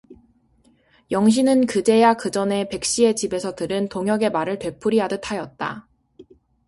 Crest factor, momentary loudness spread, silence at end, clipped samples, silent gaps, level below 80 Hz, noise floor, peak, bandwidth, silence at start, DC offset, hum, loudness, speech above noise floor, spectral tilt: 18 dB; 11 LU; 0.45 s; under 0.1%; none; -58 dBFS; -59 dBFS; -2 dBFS; 11.5 kHz; 0.1 s; under 0.1%; none; -21 LUFS; 39 dB; -4.5 dB/octave